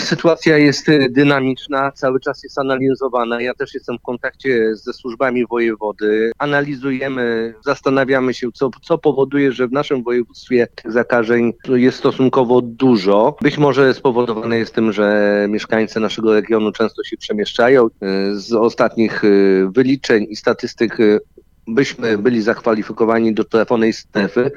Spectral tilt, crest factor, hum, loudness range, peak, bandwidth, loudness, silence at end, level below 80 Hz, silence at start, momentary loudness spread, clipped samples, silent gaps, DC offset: -6 dB/octave; 16 dB; none; 4 LU; 0 dBFS; 7.6 kHz; -16 LUFS; 0 s; -52 dBFS; 0 s; 8 LU; under 0.1%; none; under 0.1%